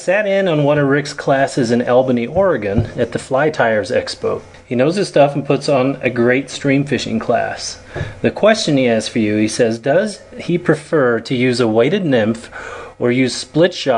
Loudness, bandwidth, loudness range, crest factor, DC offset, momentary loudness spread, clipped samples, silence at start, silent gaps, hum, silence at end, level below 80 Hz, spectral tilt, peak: -16 LUFS; 10.5 kHz; 1 LU; 16 dB; under 0.1%; 8 LU; under 0.1%; 0 s; none; none; 0 s; -46 dBFS; -5.5 dB/octave; 0 dBFS